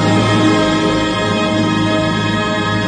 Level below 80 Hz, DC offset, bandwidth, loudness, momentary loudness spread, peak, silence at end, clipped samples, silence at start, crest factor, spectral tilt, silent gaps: -38 dBFS; under 0.1%; 10 kHz; -14 LUFS; 4 LU; -2 dBFS; 0 s; under 0.1%; 0 s; 12 dB; -5.5 dB/octave; none